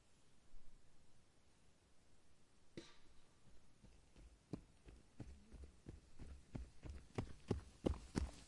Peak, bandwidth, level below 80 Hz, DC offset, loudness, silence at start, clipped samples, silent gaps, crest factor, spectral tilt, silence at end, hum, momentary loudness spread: -22 dBFS; 11.5 kHz; -60 dBFS; under 0.1%; -52 LUFS; 0 s; under 0.1%; none; 30 dB; -6.5 dB/octave; 0 s; none; 20 LU